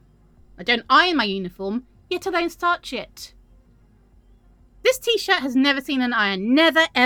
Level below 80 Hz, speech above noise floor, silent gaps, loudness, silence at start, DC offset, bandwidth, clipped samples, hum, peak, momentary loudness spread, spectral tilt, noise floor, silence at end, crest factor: -54 dBFS; 34 dB; none; -20 LUFS; 0.6 s; under 0.1%; over 20 kHz; under 0.1%; none; -2 dBFS; 15 LU; -3.5 dB/octave; -55 dBFS; 0 s; 20 dB